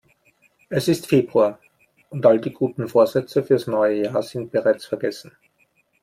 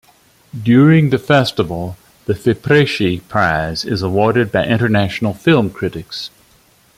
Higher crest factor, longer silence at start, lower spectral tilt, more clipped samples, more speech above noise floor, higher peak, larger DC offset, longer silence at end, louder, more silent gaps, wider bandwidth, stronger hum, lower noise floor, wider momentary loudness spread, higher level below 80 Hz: about the same, 18 dB vs 14 dB; first, 0.7 s vs 0.55 s; about the same, -6.5 dB/octave vs -7 dB/octave; neither; first, 44 dB vs 37 dB; about the same, -2 dBFS vs -2 dBFS; neither; about the same, 0.8 s vs 0.7 s; second, -21 LUFS vs -15 LUFS; neither; about the same, 16 kHz vs 15.5 kHz; neither; first, -64 dBFS vs -52 dBFS; second, 9 LU vs 15 LU; second, -64 dBFS vs -46 dBFS